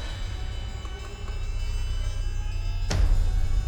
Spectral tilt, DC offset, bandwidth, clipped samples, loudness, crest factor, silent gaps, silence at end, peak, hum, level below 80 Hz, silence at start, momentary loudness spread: -5 dB/octave; under 0.1%; 9.6 kHz; under 0.1%; -31 LUFS; 14 dB; none; 0 s; -12 dBFS; none; -26 dBFS; 0 s; 10 LU